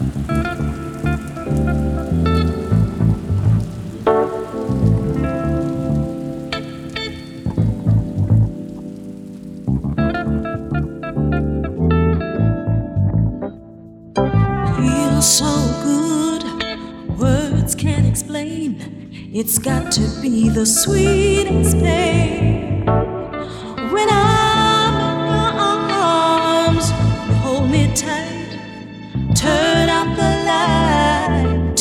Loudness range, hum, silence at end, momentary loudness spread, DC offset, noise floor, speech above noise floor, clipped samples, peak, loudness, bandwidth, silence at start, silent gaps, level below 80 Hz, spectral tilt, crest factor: 5 LU; none; 0 s; 12 LU; under 0.1%; -38 dBFS; 23 dB; under 0.1%; -2 dBFS; -17 LUFS; 17 kHz; 0 s; none; -30 dBFS; -5 dB/octave; 16 dB